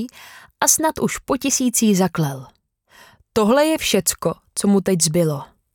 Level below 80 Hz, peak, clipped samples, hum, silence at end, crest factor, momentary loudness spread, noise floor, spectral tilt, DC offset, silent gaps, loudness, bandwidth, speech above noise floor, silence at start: -50 dBFS; 0 dBFS; under 0.1%; none; 0.3 s; 18 dB; 9 LU; -52 dBFS; -4 dB/octave; under 0.1%; none; -18 LUFS; over 20 kHz; 34 dB; 0 s